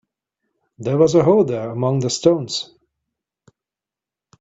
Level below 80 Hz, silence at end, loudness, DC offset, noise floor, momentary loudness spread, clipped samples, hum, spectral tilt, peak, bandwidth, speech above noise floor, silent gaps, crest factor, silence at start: -56 dBFS; 1.75 s; -18 LUFS; under 0.1%; -88 dBFS; 12 LU; under 0.1%; none; -6 dB/octave; -2 dBFS; 8.2 kHz; 72 dB; none; 20 dB; 0.8 s